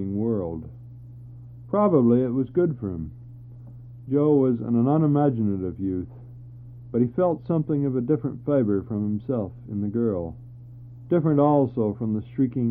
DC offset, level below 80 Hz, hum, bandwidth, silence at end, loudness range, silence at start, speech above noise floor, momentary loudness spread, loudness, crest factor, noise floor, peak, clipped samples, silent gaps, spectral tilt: under 0.1%; -52 dBFS; none; 3.7 kHz; 0 s; 3 LU; 0 s; 20 dB; 24 LU; -24 LUFS; 18 dB; -42 dBFS; -6 dBFS; under 0.1%; none; -13.5 dB/octave